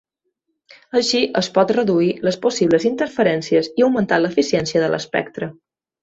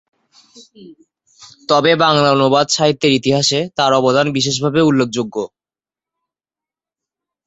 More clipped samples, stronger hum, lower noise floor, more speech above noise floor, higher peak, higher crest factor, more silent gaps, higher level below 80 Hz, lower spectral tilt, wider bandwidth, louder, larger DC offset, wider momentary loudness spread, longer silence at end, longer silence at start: neither; neither; second, -74 dBFS vs under -90 dBFS; second, 56 dB vs over 75 dB; about the same, -2 dBFS vs -2 dBFS; about the same, 16 dB vs 16 dB; neither; about the same, -58 dBFS vs -56 dBFS; about the same, -5 dB/octave vs -4.5 dB/octave; about the same, 8 kHz vs 8.2 kHz; second, -18 LUFS vs -14 LUFS; neither; second, 6 LU vs 9 LU; second, 0.5 s vs 2 s; first, 0.95 s vs 0.55 s